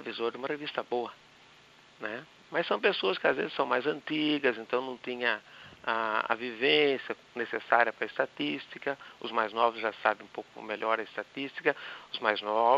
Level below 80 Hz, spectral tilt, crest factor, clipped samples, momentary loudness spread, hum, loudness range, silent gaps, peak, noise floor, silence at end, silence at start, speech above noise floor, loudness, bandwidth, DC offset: -80 dBFS; -5 dB/octave; 24 dB; under 0.1%; 13 LU; none; 3 LU; none; -6 dBFS; -58 dBFS; 0 s; 0 s; 27 dB; -31 LUFS; 7.8 kHz; under 0.1%